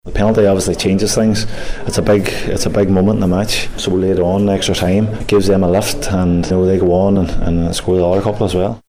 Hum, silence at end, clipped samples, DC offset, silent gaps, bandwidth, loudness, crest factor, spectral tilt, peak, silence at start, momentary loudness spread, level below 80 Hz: none; 0.1 s; under 0.1%; under 0.1%; none; 15.5 kHz; -14 LUFS; 12 dB; -5.5 dB/octave; -2 dBFS; 0.05 s; 5 LU; -28 dBFS